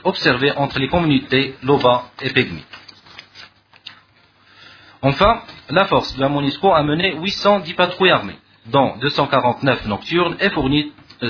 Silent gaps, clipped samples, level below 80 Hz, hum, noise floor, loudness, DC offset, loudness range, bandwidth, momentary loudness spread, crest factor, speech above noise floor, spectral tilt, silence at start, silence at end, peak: none; under 0.1%; -42 dBFS; none; -53 dBFS; -17 LUFS; under 0.1%; 6 LU; 5.4 kHz; 6 LU; 18 dB; 36 dB; -6.5 dB/octave; 0.05 s; 0 s; 0 dBFS